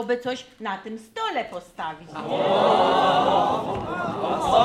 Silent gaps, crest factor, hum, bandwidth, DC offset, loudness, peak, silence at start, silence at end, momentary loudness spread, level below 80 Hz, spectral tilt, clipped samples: none; 18 dB; none; 14 kHz; under 0.1%; -23 LUFS; -6 dBFS; 0 s; 0 s; 15 LU; -54 dBFS; -5 dB/octave; under 0.1%